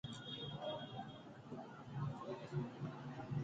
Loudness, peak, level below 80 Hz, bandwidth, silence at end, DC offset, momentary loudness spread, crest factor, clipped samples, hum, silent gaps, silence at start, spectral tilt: -48 LUFS; -30 dBFS; -72 dBFS; 8.8 kHz; 0 s; under 0.1%; 7 LU; 16 dB; under 0.1%; none; none; 0.05 s; -7 dB/octave